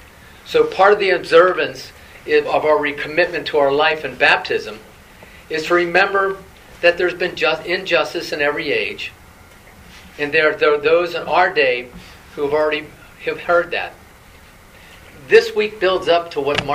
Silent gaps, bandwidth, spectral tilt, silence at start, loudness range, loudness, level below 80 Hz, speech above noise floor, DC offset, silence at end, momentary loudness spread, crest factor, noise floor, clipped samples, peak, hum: none; 15.5 kHz; -4 dB/octave; 0.45 s; 4 LU; -17 LUFS; -50 dBFS; 27 dB; under 0.1%; 0 s; 13 LU; 18 dB; -44 dBFS; under 0.1%; 0 dBFS; none